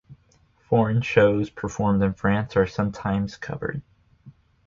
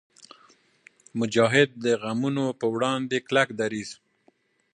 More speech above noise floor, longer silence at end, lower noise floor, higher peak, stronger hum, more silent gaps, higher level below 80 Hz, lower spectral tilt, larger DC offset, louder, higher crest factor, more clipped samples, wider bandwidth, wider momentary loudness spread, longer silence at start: about the same, 38 dB vs 41 dB; second, 0.35 s vs 0.8 s; second, -61 dBFS vs -65 dBFS; about the same, -4 dBFS vs -6 dBFS; neither; neither; first, -46 dBFS vs -70 dBFS; first, -7.5 dB/octave vs -5 dB/octave; neither; about the same, -23 LUFS vs -25 LUFS; about the same, 20 dB vs 22 dB; neither; second, 7.4 kHz vs 10.5 kHz; about the same, 12 LU vs 10 LU; second, 0.1 s vs 1.15 s